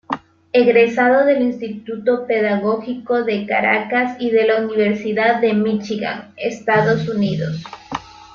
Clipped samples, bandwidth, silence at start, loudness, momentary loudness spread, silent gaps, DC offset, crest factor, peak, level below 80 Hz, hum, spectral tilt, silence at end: under 0.1%; 7.2 kHz; 0.1 s; -17 LUFS; 14 LU; none; under 0.1%; 16 dB; -2 dBFS; -58 dBFS; none; -7 dB/octave; 0.1 s